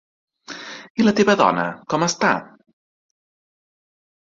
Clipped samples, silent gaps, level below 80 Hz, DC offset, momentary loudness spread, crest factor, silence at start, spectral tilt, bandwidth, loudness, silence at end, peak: under 0.1%; 0.90-0.95 s; -62 dBFS; under 0.1%; 18 LU; 20 dB; 0.5 s; -4.5 dB/octave; 7.8 kHz; -19 LUFS; 1.85 s; -2 dBFS